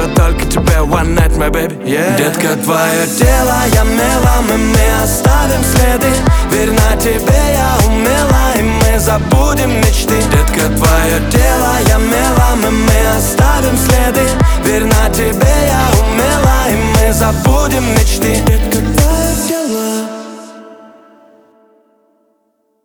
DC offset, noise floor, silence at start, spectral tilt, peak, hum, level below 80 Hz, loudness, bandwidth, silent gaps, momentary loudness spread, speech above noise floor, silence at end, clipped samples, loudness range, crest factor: under 0.1%; -60 dBFS; 0 s; -5 dB/octave; 0 dBFS; none; -14 dBFS; -11 LUFS; over 20 kHz; none; 3 LU; 50 dB; 2.1 s; under 0.1%; 3 LU; 10 dB